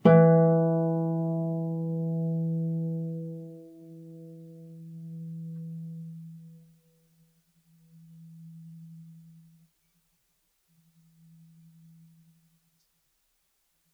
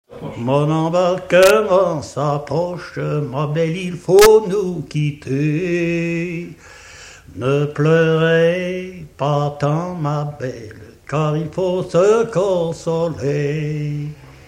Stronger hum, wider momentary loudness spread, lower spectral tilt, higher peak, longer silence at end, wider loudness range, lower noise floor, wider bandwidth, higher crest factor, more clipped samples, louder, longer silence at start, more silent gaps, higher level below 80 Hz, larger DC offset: neither; first, 26 LU vs 15 LU; first, -11 dB/octave vs -6 dB/octave; second, -6 dBFS vs 0 dBFS; first, 4.75 s vs 0.2 s; first, 24 LU vs 4 LU; first, -74 dBFS vs -40 dBFS; second, 3.4 kHz vs 16 kHz; first, 24 dB vs 18 dB; neither; second, -27 LUFS vs -17 LUFS; about the same, 0.05 s vs 0.1 s; neither; second, -82 dBFS vs -48 dBFS; neither